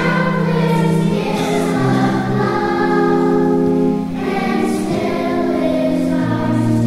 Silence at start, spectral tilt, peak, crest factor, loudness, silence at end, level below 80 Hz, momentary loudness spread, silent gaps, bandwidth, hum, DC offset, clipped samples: 0 s; -7 dB/octave; -4 dBFS; 12 dB; -16 LUFS; 0 s; -42 dBFS; 4 LU; none; 15 kHz; none; under 0.1%; under 0.1%